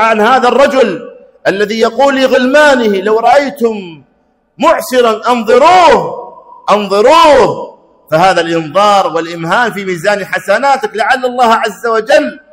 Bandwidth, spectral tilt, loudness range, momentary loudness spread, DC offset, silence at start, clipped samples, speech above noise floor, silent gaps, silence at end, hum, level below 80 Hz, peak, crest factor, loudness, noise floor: 16.5 kHz; -4 dB/octave; 3 LU; 9 LU; under 0.1%; 0 s; 0.5%; 46 dB; none; 0.15 s; none; -46 dBFS; 0 dBFS; 10 dB; -9 LUFS; -55 dBFS